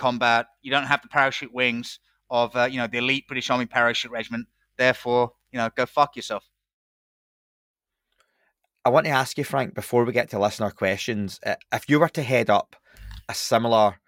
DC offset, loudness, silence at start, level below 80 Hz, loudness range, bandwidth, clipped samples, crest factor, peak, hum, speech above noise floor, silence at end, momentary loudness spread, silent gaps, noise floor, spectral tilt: under 0.1%; -23 LUFS; 0 s; -58 dBFS; 5 LU; 17 kHz; under 0.1%; 20 dB; -4 dBFS; none; 48 dB; 0.15 s; 11 LU; 6.73-7.74 s; -72 dBFS; -4.5 dB/octave